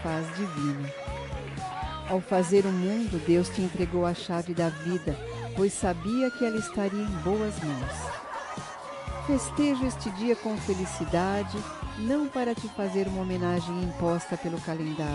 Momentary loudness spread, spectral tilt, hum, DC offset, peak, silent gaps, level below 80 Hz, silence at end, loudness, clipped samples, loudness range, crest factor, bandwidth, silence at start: 10 LU; -6 dB/octave; none; under 0.1%; -12 dBFS; none; -46 dBFS; 0 s; -29 LUFS; under 0.1%; 3 LU; 16 dB; 11.5 kHz; 0 s